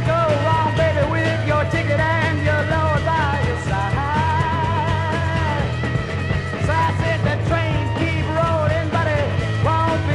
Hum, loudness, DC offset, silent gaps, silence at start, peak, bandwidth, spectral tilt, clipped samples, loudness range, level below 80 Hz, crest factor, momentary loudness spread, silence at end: none; -19 LUFS; under 0.1%; none; 0 s; -4 dBFS; 11 kHz; -6.5 dB/octave; under 0.1%; 2 LU; -36 dBFS; 14 dB; 3 LU; 0 s